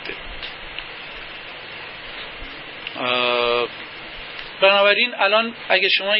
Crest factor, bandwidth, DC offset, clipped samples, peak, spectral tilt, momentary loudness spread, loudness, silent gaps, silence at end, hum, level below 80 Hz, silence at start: 20 dB; 5.8 kHz; under 0.1%; under 0.1%; -2 dBFS; -7 dB/octave; 17 LU; -18 LUFS; none; 0 s; none; -48 dBFS; 0 s